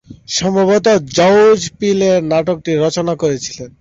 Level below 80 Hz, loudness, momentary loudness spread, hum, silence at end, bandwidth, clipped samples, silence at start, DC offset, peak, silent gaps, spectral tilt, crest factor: -48 dBFS; -13 LUFS; 8 LU; none; 0.1 s; 8 kHz; under 0.1%; 0.1 s; under 0.1%; -2 dBFS; none; -4.5 dB/octave; 12 dB